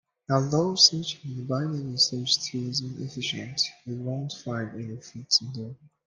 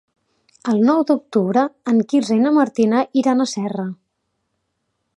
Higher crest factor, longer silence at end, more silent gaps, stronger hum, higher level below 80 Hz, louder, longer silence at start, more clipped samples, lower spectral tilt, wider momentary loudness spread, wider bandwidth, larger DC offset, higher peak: first, 24 dB vs 16 dB; second, 0.2 s vs 1.25 s; neither; neither; about the same, -68 dBFS vs -70 dBFS; second, -26 LUFS vs -18 LUFS; second, 0.3 s vs 0.65 s; neither; second, -3.5 dB/octave vs -6 dB/octave; first, 17 LU vs 9 LU; about the same, 12 kHz vs 11 kHz; neither; about the same, -4 dBFS vs -2 dBFS